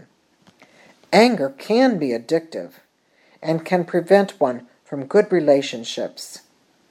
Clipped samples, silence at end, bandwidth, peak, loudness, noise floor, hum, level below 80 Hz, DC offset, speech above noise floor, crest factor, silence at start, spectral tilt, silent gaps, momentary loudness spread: under 0.1%; 0.55 s; 15 kHz; -2 dBFS; -19 LUFS; -59 dBFS; none; -76 dBFS; under 0.1%; 40 dB; 20 dB; 1.1 s; -5.5 dB/octave; none; 17 LU